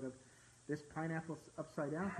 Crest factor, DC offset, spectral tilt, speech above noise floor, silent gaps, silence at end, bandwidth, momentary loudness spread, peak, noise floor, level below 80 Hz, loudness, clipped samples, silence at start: 16 dB; under 0.1%; -7 dB/octave; 21 dB; none; 0 s; 12 kHz; 17 LU; -28 dBFS; -65 dBFS; -74 dBFS; -45 LUFS; under 0.1%; 0 s